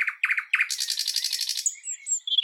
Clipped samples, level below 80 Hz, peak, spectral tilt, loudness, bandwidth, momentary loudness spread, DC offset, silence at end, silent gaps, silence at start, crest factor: under 0.1%; under -90 dBFS; -8 dBFS; 14 dB/octave; -25 LUFS; 19 kHz; 4 LU; under 0.1%; 0 s; none; 0 s; 18 dB